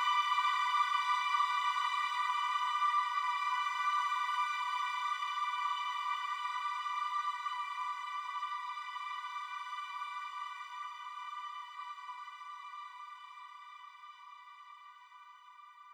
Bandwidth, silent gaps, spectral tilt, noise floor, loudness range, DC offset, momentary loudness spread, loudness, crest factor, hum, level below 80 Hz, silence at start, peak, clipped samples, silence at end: over 20 kHz; none; 7.5 dB/octave; -56 dBFS; 16 LU; under 0.1%; 21 LU; -35 LUFS; 18 dB; none; under -90 dBFS; 0 s; -20 dBFS; under 0.1%; 0 s